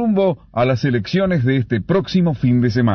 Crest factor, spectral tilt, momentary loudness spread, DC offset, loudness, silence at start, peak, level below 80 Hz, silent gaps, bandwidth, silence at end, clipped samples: 12 dB; -8.5 dB/octave; 3 LU; under 0.1%; -17 LUFS; 0 s; -6 dBFS; -44 dBFS; none; 6.4 kHz; 0 s; under 0.1%